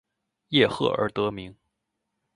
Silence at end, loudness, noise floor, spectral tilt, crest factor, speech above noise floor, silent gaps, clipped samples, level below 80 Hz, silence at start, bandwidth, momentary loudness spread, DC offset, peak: 0.85 s; -24 LUFS; -81 dBFS; -6 dB/octave; 22 dB; 56 dB; none; under 0.1%; -60 dBFS; 0.5 s; 11 kHz; 16 LU; under 0.1%; -6 dBFS